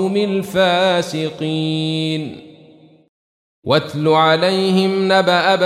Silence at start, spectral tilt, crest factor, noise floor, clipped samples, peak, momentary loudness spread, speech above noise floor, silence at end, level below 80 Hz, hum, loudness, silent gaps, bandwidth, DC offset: 0 s; -5.5 dB/octave; 16 dB; -46 dBFS; under 0.1%; -2 dBFS; 9 LU; 30 dB; 0 s; -60 dBFS; none; -16 LUFS; 3.09-3.62 s; 15 kHz; under 0.1%